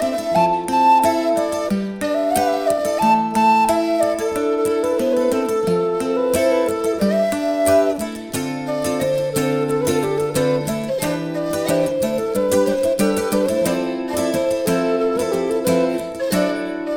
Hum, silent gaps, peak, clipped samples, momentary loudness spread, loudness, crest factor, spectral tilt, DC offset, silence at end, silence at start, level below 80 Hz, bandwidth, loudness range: none; none; -4 dBFS; under 0.1%; 6 LU; -19 LUFS; 14 dB; -5 dB/octave; under 0.1%; 0 s; 0 s; -52 dBFS; over 20 kHz; 3 LU